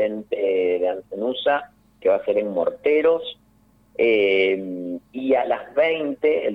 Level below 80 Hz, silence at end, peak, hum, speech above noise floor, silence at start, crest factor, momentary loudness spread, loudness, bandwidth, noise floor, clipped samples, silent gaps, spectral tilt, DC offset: -62 dBFS; 0 s; -8 dBFS; none; 36 dB; 0 s; 14 dB; 9 LU; -22 LUFS; 5 kHz; -57 dBFS; under 0.1%; none; -6.5 dB/octave; under 0.1%